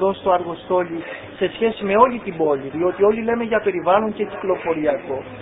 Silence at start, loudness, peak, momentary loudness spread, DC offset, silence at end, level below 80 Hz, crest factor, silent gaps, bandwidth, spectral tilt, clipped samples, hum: 0 s; -20 LUFS; 0 dBFS; 8 LU; under 0.1%; 0 s; -52 dBFS; 20 dB; none; 4 kHz; -11 dB/octave; under 0.1%; none